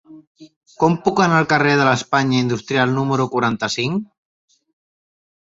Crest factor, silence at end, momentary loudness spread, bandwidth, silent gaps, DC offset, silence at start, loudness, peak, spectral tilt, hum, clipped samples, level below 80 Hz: 18 dB; 1.45 s; 6 LU; 8 kHz; 0.27-0.35 s, 0.56-0.61 s; under 0.1%; 0.1 s; -17 LUFS; -2 dBFS; -5.5 dB/octave; none; under 0.1%; -56 dBFS